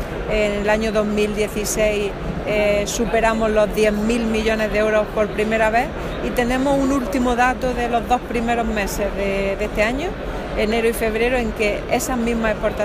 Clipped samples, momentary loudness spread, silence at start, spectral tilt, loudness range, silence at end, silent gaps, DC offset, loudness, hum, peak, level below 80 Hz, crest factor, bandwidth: under 0.1%; 5 LU; 0 s; -4.5 dB/octave; 2 LU; 0 s; none; under 0.1%; -20 LUFS; none; -4 dBFS; -32 dBFS; 16 dB; 15.5 kHz